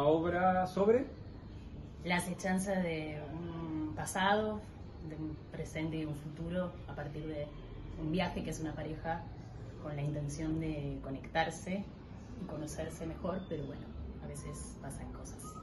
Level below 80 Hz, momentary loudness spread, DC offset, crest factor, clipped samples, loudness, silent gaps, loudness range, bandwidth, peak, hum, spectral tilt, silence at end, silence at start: -52 dBFS; 16 LU; under 0.1%; 20 dB; under 0.1%; -38 LUFS; none; 6 LU; 12.5 kHz; -18 dBFS; none; -6 dB/octave; 0 s; 0 s